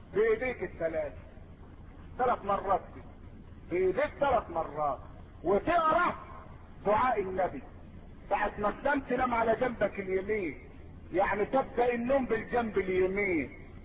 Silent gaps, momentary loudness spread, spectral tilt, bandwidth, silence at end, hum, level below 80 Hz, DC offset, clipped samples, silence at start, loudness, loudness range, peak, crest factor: none; 22 LU; -10 dB/octave; 4.9 kHz; 0 s; none; -50 dBFS; under 0.1%; under 0.1%; 0 s; -31 LUFS; 3 LU; -16 dBFS; 14 dB